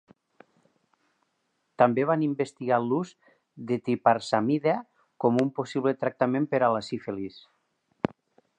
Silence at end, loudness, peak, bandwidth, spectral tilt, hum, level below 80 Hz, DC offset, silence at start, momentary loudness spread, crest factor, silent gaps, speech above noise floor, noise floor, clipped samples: 1.2 s; -27 LUFS; -6 dBFS; 9.6 kHz; -7 dB/octave; none; -72 dBFS; under 0.1%; 1.8 s; 10 LU; 22 dB; none; 50 dB; -76 dBFS; under 0.1%